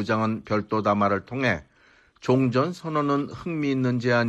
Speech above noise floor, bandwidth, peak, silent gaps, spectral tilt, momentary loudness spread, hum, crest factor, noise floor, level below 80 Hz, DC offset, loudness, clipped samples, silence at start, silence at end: 34 dB; 8.6 kHz; -8 dBFS; none; -7 dB/octave; 6 LU; none; 16 dB; -58 dBFS; -58 dBFS; under 0.1%; -25 LUFS; under 0.1%; 0 s; 0 s